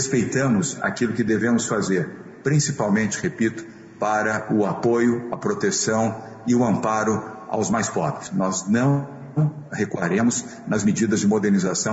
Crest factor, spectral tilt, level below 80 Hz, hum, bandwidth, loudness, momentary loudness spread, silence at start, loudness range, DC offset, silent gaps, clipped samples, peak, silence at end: 12 dB; -5 dB/octave; -58 dBFS; none; 8 kHz; -22 LUFS; 7 LU; 0 s; 1 LU; under 0.1%; none; under 0.1%; -8 dBFS; 0 s